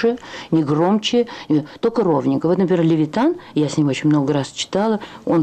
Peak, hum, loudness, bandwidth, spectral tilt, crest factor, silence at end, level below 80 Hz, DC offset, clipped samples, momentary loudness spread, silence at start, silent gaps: -8 dBFS; none; -19 LUFS; 9.2 kHz; -6.5 dB/octave; 10 dB; 0 s; -58 dBFS; under 0.1%; under 0.1%; 5 LU; 0 s; none